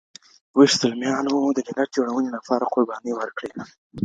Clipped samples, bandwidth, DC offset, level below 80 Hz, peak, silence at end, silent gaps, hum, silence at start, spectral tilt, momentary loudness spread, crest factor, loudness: under 0.1%; 9.2 kHz; under 0.1%; -66 dBFS; -2 dBFS; 0 s; 3.78-3.90 s; none; 0.55 s; -4 dB/octave; 15 LU; 20 dB; -22 LUFS